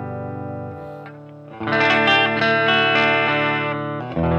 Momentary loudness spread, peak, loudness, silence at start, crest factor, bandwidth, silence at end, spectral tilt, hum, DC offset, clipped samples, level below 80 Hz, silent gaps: 18 LU; -4 dBFS; -17 LUFS; 0 s; 16 dB; 8.4 kHz; 0 s; -6 dB/octave; none; under 0.1%; under 0.1%; -50 dBFS; none